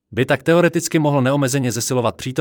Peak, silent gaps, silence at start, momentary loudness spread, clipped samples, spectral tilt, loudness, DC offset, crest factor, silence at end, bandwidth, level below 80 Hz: -4 dBFS; none; 0.1 s; 4 LU; under 0.1%; -5 dB/octave; -18 LUFS; under 0.1%; 14 dB; 0 s; 18.5 kHz; -58 dBFS